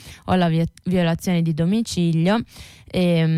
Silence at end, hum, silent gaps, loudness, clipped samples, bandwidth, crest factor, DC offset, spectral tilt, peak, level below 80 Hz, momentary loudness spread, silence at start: 0 s; none; none; -21 LUFS; under 0.1%; 13.5 kHz; 10 dB; under 0.1%; -6.5 dB/octave; -10 dBFS; -46 dBFS; 5 LU; 0.05 s